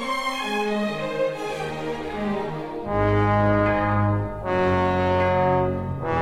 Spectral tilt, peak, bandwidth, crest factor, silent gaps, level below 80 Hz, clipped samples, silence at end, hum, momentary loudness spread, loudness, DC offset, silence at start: -7 dB/octave; -8 dBFS; 13.5 kHz; 14 dB; none; -42 dBFS; under 0.1%; 0 s; none; 9 LU; -23 LUFS; under 0.1%; 0 s